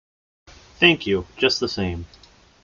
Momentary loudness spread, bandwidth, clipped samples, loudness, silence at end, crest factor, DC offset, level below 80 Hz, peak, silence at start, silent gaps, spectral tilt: 11 LU; 7.4 kHz; under 0.1%; -20 LUFS; 0.55 s; 22 dB; under 0.1%; -50 dBFS; -2 dBFS; 0.8 s; none; -4.5 dB/octave